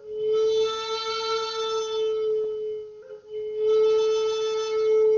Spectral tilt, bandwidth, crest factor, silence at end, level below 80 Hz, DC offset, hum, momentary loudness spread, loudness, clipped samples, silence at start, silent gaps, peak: 0.5 dB/octave; 7.2 kHz; 10 dB; 0 s; -66 dBFS; under 0.1%; none; 13 LU; -25 LUFS; under 0.1%; 0 s; none; -14 dBFS